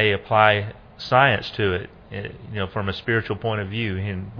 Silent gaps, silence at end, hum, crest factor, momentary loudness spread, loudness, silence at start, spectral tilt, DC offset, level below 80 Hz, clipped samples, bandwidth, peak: none; 0 s; none; 22 dB; 17 LU; -22 LUFS; 0 s; -7.5 dB/octave; under 0.1%; -50 dBFS; under 0.1%; 5.4 kHz; 0 dBFS